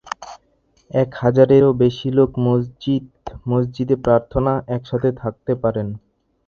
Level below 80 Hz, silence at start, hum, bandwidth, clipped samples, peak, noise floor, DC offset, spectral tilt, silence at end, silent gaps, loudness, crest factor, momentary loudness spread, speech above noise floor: -44 dBFS; 0.05 s; none; 7 kHz; under 0.1%; 0 dBFS; -60 dBFS; under 0.1%; -8.5 dB/octave; 0.5 s; none; -18 LUFS; 18 dB; 17 LU; 43 dB